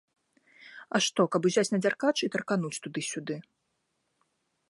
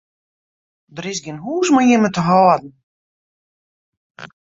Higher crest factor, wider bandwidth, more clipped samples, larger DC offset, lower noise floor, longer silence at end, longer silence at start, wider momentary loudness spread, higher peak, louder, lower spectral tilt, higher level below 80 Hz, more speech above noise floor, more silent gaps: about the same, 22 dB vs 18 dB; first, 11.5 kHz vs 7.8 kHz; neither; neither; second, -78 dBFS vs under -90 dBFS; first, 1.3 s vs 0.15 s; second, 0.6 s vs 0.95 s; about the same, 13 LU vs 14 LU; second, -10 dBFS vs -2 dBFS; second, -29 LUFS vs -16 LUFS; second, -4 dB/octave vs -5.5 dB/octave; second, -80 dBFS vs -60 dBFS; second, 50 dB vs over 75 dB; second, none vs 2.83-4.15 s